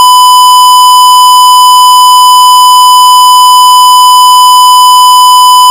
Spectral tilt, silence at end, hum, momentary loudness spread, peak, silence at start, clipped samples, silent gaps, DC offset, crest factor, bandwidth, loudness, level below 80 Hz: 3.5 dB/octave; 0 s; none; 0 LU; 0 dBFS; 0 s; 20%; none; 0.3%; 0 dB; over 20 kHz; 0 LUFS; -60 dBFS